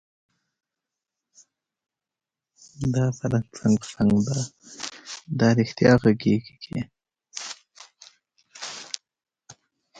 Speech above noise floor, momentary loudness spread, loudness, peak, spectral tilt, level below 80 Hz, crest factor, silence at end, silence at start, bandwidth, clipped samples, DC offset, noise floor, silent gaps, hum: 67 dB; 18 LU; -24 LUFS; -4 dBFS; -6 dB/octave; -54 dBFS; 22 dB; 0.45 s; 2.8 s; 9.2 kHz; under 0.1%; under 0.1%; -89 dBFS; none; none